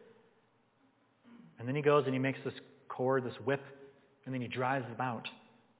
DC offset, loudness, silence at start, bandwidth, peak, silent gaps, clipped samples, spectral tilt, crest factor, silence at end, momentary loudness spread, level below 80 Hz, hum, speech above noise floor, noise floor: under 0.1%; -35 LUFS; 0 s; 4 kHz; -14 dBFS; none; under 0.1%; -5.5 dB/octave; 22 dB; 0.4 s; 18 LU; -80 dBFS; none; 37 dB; -71 dBFS